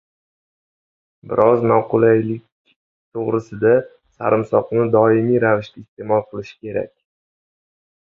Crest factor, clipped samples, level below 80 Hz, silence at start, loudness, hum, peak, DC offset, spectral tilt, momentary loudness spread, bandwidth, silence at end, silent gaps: 18 dB; under 0.1%; -58 dBFS; 1.25 s; -18 LUFS; none; 0 dBFS; under 0.1%; -9.5 dB/octave; 16 LU; 6.8 kHz; 1.15 s; 2.52-2.65 s, 2.76-3.12 s, 5.88-5.97 s